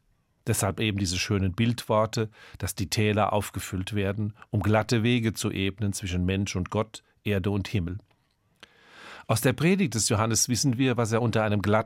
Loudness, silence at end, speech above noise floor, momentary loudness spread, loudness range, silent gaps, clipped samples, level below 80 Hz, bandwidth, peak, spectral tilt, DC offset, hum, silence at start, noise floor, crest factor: -26 LUFS; 0 s; 43 dB; 10 LU; 5 LU; none; under 0.1%; -56 dBFS; 16 kHz; -8 dBFS; -5 dB/octave; under 0.1%; none; 0.45 s; -68 dBFS; 18 dB